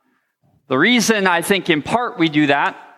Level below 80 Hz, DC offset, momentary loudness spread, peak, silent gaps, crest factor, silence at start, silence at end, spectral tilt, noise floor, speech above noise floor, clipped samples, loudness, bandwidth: -60 dBFS; under 0.1%; 4 LU; -2 dBFS; none; 16 dB; 0.7 s; 0.15 s; -4 dB/octave; -63 dBFS; 46 dB; under 0.1%; -16 LUFS; 15.5 kHz